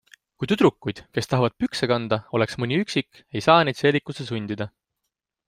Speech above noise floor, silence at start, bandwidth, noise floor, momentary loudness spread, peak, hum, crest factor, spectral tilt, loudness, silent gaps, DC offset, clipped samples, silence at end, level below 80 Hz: 59 dB; 0.4 s; 15.5 kHz; -82 dBFS; 14 LU; -2 dBFS; none; 22 dB; -6 dB/octave; -23 LUFS; none; under 0.1%; under 0.1%; 0.8 s; -58 dBFS